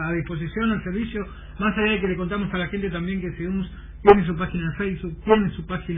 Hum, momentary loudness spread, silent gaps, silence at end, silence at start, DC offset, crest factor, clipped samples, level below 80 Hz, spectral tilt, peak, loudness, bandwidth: none; 12 LU; none; 0 s; 0 s; under 0.1%; 24 dB; under 0.1%; -38 dBFS; -10.5 dB/octave; 0 dBFS; -23 LUFS; 4.3 kHz